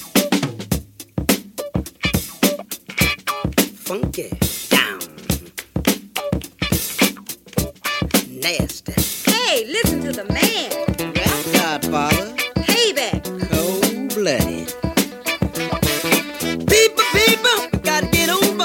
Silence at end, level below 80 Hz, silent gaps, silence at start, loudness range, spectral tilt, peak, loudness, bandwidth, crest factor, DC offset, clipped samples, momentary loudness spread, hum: 0 s; -36 dBFS; none; 0 s; 5 LU; -3.5 dB/octave; 0 dBFS; -19 LUFS; 17 kHz; 20 dB; under 0.1%; under 0.1%; 9 LU; none